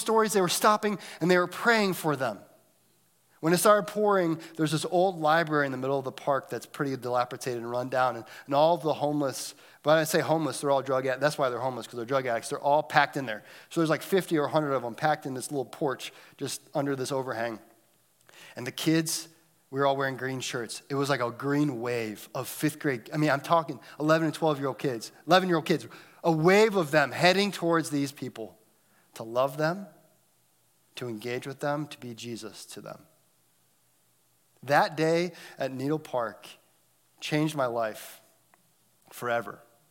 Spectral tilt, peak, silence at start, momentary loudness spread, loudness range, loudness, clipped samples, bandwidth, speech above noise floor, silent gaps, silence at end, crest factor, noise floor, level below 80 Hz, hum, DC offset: -4.5 dB/octave; -4 dBFS; 0 s; 15 LU; 8 LU; -28 LUFS; under 0.1%; 17 kHz; 40 dB; none; 0.35 s; 24 dB; -68 dBFS; -80 dBFS; none; under 0.1%